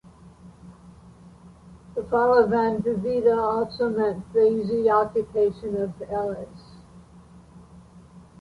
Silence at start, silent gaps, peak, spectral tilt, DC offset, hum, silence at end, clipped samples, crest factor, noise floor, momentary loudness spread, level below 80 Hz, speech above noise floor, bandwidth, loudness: 0.25 s; none; -6 dBFS; -8 dB/octave; under 0.1%; none; 0.2 s; under 0.1%; 18 dB; -49 dBFS; 10 LU; -54 dBFS; 26 dB; 10.5 kHz; -23 LUFS